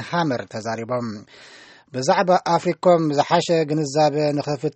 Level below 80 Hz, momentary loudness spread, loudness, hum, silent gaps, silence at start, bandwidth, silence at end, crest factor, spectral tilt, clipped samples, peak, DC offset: -64 dBFS; 11 LU; -20 LUFS; none; none; 0 s; 8.8 kHz; 0.05 s; 18 dB; -5.5 dB/octave; under 0.1%; -4 dBFS; under 0.1%